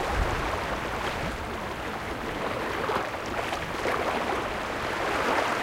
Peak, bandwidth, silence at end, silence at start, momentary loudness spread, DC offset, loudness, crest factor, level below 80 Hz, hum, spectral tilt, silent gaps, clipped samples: -14 dBFS; 16 kHz; 0 s; 0 s; 6 LU; under 0.1%; -29 LUFS; 16 dB; -40 dBFS; none; -4.5 dB/octave; none; under 0.1%